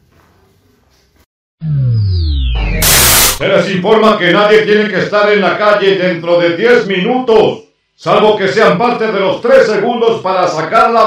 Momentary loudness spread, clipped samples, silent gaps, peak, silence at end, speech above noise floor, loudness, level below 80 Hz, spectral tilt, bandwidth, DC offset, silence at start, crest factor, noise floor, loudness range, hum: 7 LU; 1%; none; 0 dBFS; 0 s; 42 dB; -10 LUFS; -26 dBFS; -4 dB/octave; over 20 kHz; under 0.1%; 1.6 s; 10 dB; -51 dBFS; 3 LU; none